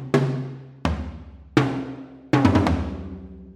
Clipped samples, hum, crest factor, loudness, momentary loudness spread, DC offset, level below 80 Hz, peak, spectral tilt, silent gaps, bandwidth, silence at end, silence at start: under 0.1%; none; 20 dB; -23 LUFS; 19 LU; under 0.1%; -38 dBFS; -4 dBFS; -7.5 dB/octave; none; 11.5 kHz; 0.05 s; 0 s